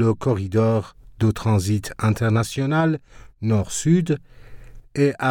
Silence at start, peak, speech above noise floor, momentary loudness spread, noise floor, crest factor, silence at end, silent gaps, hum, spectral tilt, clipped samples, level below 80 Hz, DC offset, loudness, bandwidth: 0 s; -6 dBFS; 19 dB; 7 LU; -39 dBFS; 14 dB; 0 s; none; none; -6.5 dB/octave; under 0.1%; -46 dBFS; under 0.1%; -22 LUFS; 16 kHz